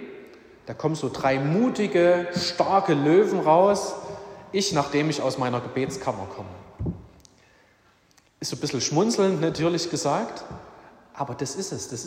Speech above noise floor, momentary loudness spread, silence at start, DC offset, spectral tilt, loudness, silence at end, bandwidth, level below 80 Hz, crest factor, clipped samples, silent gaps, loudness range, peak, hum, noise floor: 37 dB; 19 LU; 0 s; under 0.1%; -5 dB/octave; -24 LUFS; 0 s; 16 kHz; -56 dBFS; 20 dB; under 0.1%; none; 10 LU; -6 dBFS; none; -60 dBFS